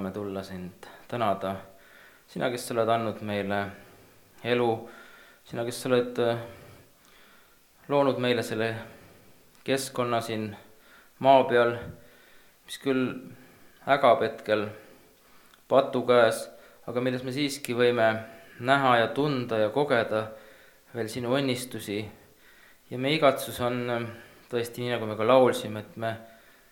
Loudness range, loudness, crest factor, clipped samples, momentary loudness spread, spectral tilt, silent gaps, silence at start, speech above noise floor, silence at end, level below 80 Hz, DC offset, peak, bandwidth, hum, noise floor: 5 LU; -27 LUFS; 22 dB; under 0.1%; 18 LU; -5 dB/octave; none; 0 s; 32 dB; 0.45 s; -68 dBFS; under 0.1%; -6 dBFS; 19 kHz; none; -58 dBFS